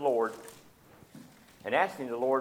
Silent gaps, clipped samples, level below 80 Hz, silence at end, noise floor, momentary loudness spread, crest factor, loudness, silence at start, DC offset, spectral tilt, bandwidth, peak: none; under 0.1%; -74 dBFS; 0 s; -57 dBFS; 23 LU; 20 dB; -31 LUFS; 0 s; under 0.1%; -5 dB/octave; 17 kHz; -12 dBFS